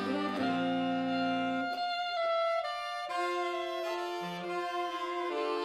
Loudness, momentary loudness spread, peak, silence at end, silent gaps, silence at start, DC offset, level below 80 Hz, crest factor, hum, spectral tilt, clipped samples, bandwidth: -33 LUFS; 5 LU; -20 dBFS; 0 s; none; 0 s; under 0.1%; -76 dBFS; 12 dB; none; -5 dB/octave; under 0.1%; 14 kHz